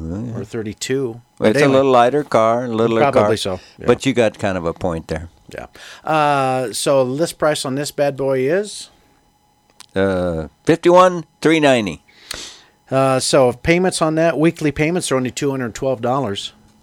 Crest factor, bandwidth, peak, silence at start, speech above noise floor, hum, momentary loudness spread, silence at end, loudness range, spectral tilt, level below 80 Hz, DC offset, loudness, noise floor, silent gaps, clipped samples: 18 dB; 17 kHz; 0 dBFS; 0 s; 41 dB; none; 15 LU; 0.35 s; 4 LU; -5 dB/octave; -46 dBFS; under 0.1%; -17 LUFS; -58 dBFS; none; under 0.1%